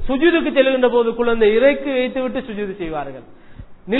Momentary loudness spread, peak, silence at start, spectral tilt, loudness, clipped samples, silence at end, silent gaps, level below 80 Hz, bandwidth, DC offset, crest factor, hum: 12 LU; -2 dBFS; 0 s; -8.5 dB/octave; -17 LUFS; under 0.1%; 0 s; none; -38 dBFS; 4.1 kHz; under 0.1%; 16 dB; none